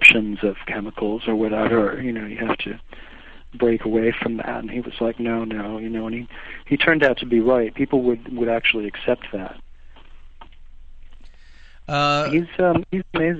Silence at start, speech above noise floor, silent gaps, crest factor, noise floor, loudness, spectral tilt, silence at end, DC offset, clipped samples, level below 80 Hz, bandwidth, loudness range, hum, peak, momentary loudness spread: 0 s; 21 dB; none; 22 dB; -42 dBFS; -21 LUFS; -6 dB/octave; 0 s; under 0.1%; under 0.1%; -42 dBFS; 8.8 kHz; 6 LU; none; 0 dBFS; 11 LU